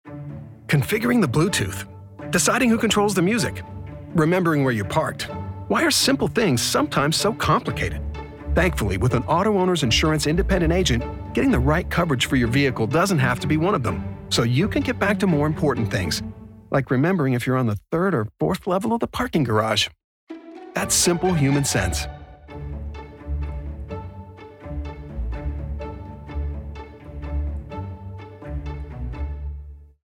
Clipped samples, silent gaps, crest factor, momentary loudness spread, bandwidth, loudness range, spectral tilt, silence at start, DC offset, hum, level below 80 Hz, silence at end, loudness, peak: under 0.1%; 20.04-20.27 s; 14 dB; 17 LU; 17.5 kHz; 12 LU; -4.5 dB/octave; 0.05 s; under 0.1%; none; -36 dBFS; 0.2 s; -21 LUFS; -8 dBFS